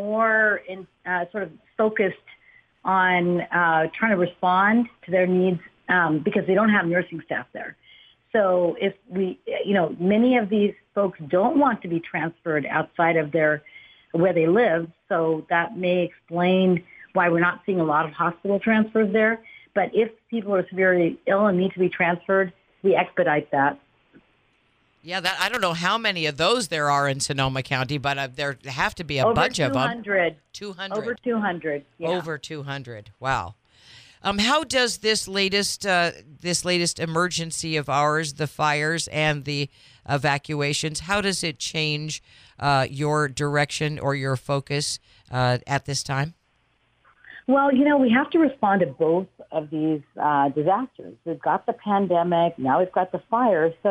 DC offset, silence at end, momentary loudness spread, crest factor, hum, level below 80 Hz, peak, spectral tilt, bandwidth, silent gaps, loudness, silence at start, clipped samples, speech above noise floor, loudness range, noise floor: under 0.1%; 0 s; 10 LU; 18 dB; none; -56 dBFS; -4 dBFS; -4.5 dB/octave; 15.5 kHz; none; -23 LUFS; 0 s; under 0.1%; 44 dB; 4 LU; -66 dBFS